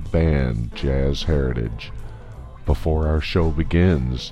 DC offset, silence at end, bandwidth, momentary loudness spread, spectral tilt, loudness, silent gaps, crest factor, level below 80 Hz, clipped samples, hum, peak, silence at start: under 0.1%; 0 s; 8.4 kHz; 17 LU; -7.5 dB/octave; -22 LUFS; none; 14 dB; -26 dBFS; under 0.1%; none; -6 dBFS; 0 s